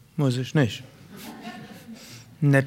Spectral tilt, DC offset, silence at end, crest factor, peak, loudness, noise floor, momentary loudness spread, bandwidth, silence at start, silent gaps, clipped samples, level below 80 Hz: -6.5 dB/octave; under 0.1%; 0 s; 20 dB; -6 dBFS; -25 LUFS; -44 dBFS; 19 LU; 15.5 kHz; 0.15 s; none; under 0.1%; -64 dBFS